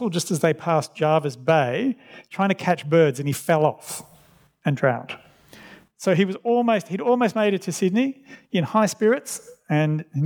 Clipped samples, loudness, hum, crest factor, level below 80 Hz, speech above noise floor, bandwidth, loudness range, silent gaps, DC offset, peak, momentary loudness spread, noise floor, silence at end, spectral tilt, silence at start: under 0.1%; -22 LUFS; none; 18 dB; -74 dBFS; 34 dB; over 20 kHz; 3 LU; none; under 0.1%; -4 dBFS; 13 LU; -56 dBFS; 0 s; -6 dB/octave; 0 s